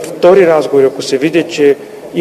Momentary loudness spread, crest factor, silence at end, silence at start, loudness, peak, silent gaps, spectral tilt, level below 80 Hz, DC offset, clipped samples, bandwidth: 8 LU; 10 dB; 0 s; 0 s; -10 LUFS; 0 dBFS; none; -5 dB/octave; -54 dBFS; under 0.1%; 0.6%; 14 kHz